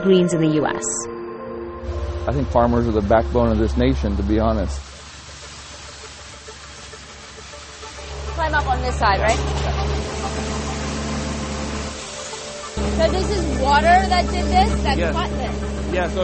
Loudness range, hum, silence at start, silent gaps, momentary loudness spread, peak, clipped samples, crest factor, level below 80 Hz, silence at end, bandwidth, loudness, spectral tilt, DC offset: 9 LU; none; 0 s; none; 19 LU; 0 dBFS; under 0.1%; 20 dB; -28 dBFS; 0 s; 8.8 kHz; -21 LUFS; -5 dB/octave; under 0.1%